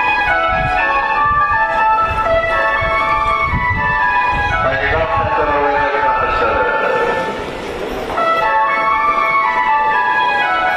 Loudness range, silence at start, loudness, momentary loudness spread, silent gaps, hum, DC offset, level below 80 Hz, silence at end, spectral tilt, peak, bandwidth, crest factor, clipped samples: 2 LU; 0 s; -14 LUFS; 3 LU; none; none; under 0.1%; -32 dBFS; 0 s; -5.5 dB/octave; -4 dBFS; 14 kHz; 12 dB; under 0.1%